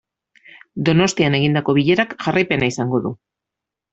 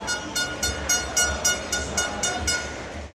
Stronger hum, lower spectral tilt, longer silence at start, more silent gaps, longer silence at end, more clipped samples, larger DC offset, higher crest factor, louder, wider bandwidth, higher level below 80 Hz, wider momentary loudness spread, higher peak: neither; first, -5.5 dB/octave vs -1 dB/octave; first, 0.75 s vs 0 s; neither; first, 0.75 s vs 0.05 s; neither; neither; about the same, 18 dB vs 18 dB; first, -18 LUFS vs -24 LUFS; second, 8.2 kHz vs 15.5 kHz; second, -52 dBFS vs -38 dBFS; first, 9 LU vs 6 LU; first, -2 dBFS vs -8 dBFS